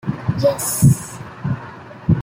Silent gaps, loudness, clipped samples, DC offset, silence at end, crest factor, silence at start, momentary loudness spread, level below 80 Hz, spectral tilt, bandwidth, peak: none; -19 LUFS; under 0.1%; under 0.1%; 0 s; 16 dB; 0.05 s; 14 LU; -42 dBFS; -6 dB/octave; 16.5 kHz; -2 dBFS